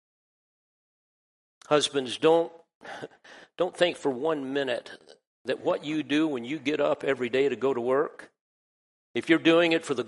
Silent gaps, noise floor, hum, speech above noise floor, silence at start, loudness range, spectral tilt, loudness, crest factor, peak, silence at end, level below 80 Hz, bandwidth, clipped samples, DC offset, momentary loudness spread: 2.75-2.81 s, 5.27-5.45 s, 8.41-9.14 s; under -90 dBFS; none; over 64 dB; 1.7 s; 4 LU; -4.5 dB/octave; -26 LUFS; 22 dB; -6 dBFS; 0 s; -74 dBFS; 11.5 kHz; under 0.1%; under 0.1%; 13 LU